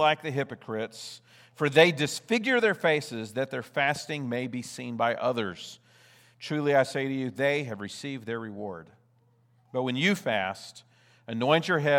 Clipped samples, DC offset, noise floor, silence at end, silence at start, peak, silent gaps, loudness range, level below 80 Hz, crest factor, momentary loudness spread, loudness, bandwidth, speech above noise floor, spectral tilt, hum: under 0.1%; under 0.1%; -65 dBFS; 0 s; 0 s; -4 dBFS; none; 6 LU; -78 dBFS; 24 dB; 15 LU; -28 LUFS; 17.5 kHz; 37 dB; -5 dB/octave; none